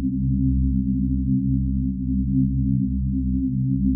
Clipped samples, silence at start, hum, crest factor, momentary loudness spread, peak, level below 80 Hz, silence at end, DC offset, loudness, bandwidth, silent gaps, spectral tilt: under 0.1%; 0 s; none; 12 dB; 3 LU; -10 dBFS; -28 dBFS; 0 s; under 0.1%; -23 LUFS; 0.4 kHz; none; -17.5 dB/octave